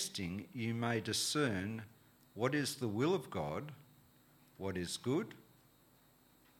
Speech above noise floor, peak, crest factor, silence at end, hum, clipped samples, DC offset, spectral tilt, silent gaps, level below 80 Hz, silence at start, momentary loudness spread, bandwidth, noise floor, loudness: 30 dB; -18 dBFS; 22 dB; 1.2 s; none; under 0.1%; under 0.1%; -4.5 dB/octave; none; -72 dBFS; 0 s; 15 LU; 17.5 kHz; -68 dBFS; -38 LUFS